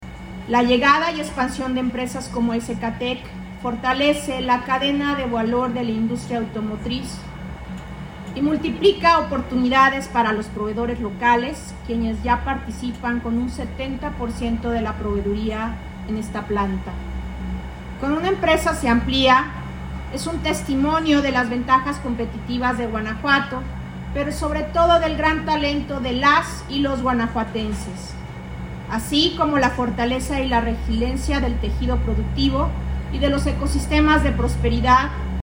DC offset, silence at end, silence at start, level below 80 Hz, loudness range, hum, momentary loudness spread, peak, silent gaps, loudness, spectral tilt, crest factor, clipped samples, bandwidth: under 0.1%; 0 s; 0 s; -30 dBFS; 6 LU; none; 14 LU; -4 dBFS; none; -21 LUFS; -5.5 dB/octave; 18 dB; under 0.1%; 16 kHz